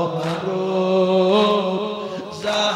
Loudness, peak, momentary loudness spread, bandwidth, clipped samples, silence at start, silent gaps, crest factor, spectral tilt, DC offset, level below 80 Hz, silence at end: -20 LUFS; -6 dBFS; 11 LU; 12.5 kHz; under 0.1%; 0 s; none; 14 dB; -5.5 dB/octave; under 0.1%; -62 dBFS; 0 s